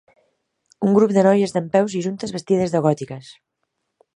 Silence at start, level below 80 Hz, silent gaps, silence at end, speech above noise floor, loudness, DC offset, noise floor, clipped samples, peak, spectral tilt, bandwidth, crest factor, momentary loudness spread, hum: 0.8 s; -62 dBFS; none; 0.85 s; 57 dB; -19 LUFS; under 0.1%; -76 dBFS; under 0.1%; -2 dBFS; -7 dB/octave; 11 kHz; 18 dB; 12 LU; none